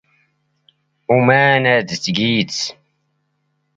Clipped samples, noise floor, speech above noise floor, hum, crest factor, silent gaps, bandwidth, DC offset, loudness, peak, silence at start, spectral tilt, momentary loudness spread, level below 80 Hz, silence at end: under 0.1%; -68 dBFS; 53 dB; none; 18 dB; none; 9 kHz; under 0.1%; -15 LUFS; 0 dBFS; 1.1 s; -4.5 dB/octave; 12 LU; -58 dBFS; 1.05 s